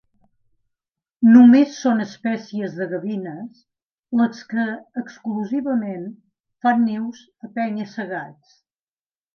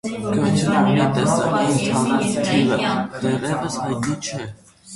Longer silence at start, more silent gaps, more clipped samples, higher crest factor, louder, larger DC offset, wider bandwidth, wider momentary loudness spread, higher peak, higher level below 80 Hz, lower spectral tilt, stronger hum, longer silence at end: first, 1.2 s vs 0.05 s; first, 3.85-4.03 s, 6.40-6.44 s vs none; neither; about the same, 20 dB vs 16 dB; about the same, -20 LUFS vs -20 LUFS; neither; second, 6.6 kHz vs 11.5 kHz; first, 20 LU vs 7 LU; about the same, -2 dBFS vs -4 dBFS; second, -74 dBFS vs -50 dBFS; about the same, -6.5 dB/octave vs -5.5 dB/octave; neither; first, 1.05 s vs 0 s